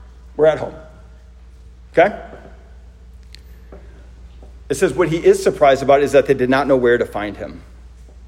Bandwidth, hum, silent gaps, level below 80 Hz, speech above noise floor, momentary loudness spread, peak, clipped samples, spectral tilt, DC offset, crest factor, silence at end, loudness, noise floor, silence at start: 15.5 kHz; none; none; -40 dBFS; 26 dB; 18 LU; 0 dBFS; under 0.1%; -5.5 dB/octave; under 0.1%; 18 dB; 0 s; -16 LUFS; -41 dBFS; 0 s